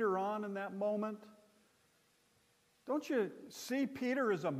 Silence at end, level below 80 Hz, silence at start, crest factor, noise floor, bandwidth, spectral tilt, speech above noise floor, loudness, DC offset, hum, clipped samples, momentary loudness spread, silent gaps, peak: 0 s; -88 dBFS; 0 s; 14 dB; -73 dBFS; 15.5 kHz; -5.5 dB/octave; 36 dB; -38 LUFS; under 0.1%; none; under 0.1%; 10 LU; none; -24 dBFS